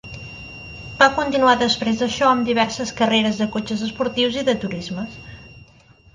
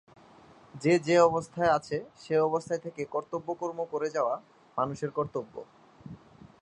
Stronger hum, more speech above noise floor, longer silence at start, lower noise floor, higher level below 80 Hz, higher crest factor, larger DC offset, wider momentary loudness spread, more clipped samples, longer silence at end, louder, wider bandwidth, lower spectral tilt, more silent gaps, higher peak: neither; first, 31 dB vs 27 dB; second, 0.05 s vs 0.75 s; second, -50 dBFS vs -55 dBFS; first, -48 dBFS vs -66 dBFS; about the same, 20 dB vs 22 dB; neither; about the same, 19 LU vs 19 LU; neither; about the same, 0.55 s vs 0.45 s; first, -19 LUFS vs -29 LUFS; about the same, 9.6 kHz vs 10.5 kHz; second, -4 dB/octave vs -6 dB/octave; neither; first, 0 dBFS vs -8 dBFS